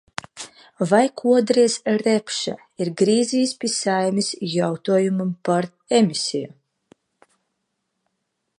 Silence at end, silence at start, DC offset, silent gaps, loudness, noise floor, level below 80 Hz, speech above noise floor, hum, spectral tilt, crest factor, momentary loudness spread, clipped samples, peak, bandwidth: 2.1 s; 0.35 s; under 0.1%; none; -21 LUFS; -76 dBFS; -70 dBFS; 56 dB; none; -4.5 dB/octave; 20 dB; 12 LU; under 0.1%; -2 dBFS; 11.5 kHz